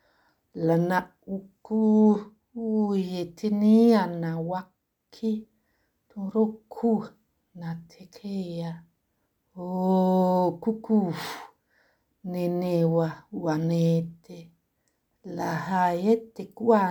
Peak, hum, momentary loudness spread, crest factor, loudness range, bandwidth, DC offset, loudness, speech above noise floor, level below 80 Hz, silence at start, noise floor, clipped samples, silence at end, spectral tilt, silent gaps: -8 dBFS; none; 19 LU; 20 dB; 8 LU; 19 kHz; under 0.1%; -26 LUFS; 50 dB; -68 dBFS; 0.55 s; -75 dBFS; under 0.1%; 0 s; -8 dB/octave; none